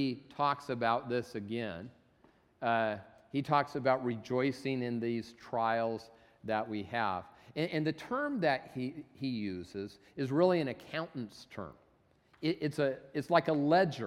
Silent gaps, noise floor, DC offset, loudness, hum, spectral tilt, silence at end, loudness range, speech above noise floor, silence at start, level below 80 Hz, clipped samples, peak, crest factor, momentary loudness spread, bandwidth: none; -69 dBFS; under 0.1%; -34 LUFS; none; -7 dB/octave; 0 s; 2 LU; 35 dB; 0 s; -72 dBFS; under 0.1%; -12 dBFS; 22 dB; 14 LU; 14 kHz